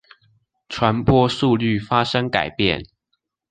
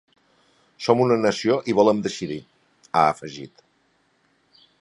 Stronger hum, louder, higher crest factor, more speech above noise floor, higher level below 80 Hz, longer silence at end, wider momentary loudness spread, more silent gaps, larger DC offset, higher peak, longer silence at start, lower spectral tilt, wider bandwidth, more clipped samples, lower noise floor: neither; about the same, -19 LUFS vs -21 LUFS; about the same, 18 dB vs 20 dB; first, 56 dB vs 44 dB; first, -42 dBFS vs -64 dBFS; second, 0.65 s vs 1.35 s; second, 5 LU vs 17 LU; neither; neither; about the same, -2 dBFS vs -2 dBFS; about the same, 0.7 s vs 0.8 s; about the same, -6.5 dB/octave vs -5.5 dB/octave; second, 9.4 kHz vs 11.5 kHz; neither; first, -74 dBFS vs -65 dBFS